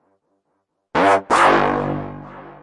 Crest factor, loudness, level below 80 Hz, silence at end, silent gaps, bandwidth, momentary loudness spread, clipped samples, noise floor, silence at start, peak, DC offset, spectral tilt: 18 dB; -17 LUFS; -48 dBFS; 0.1 s; none; 11.5 kHz; 20 LU; under 0.1%; -72 dBFS; 0.95 s; -2 dBFS; under 0.1%; -5 dB/octave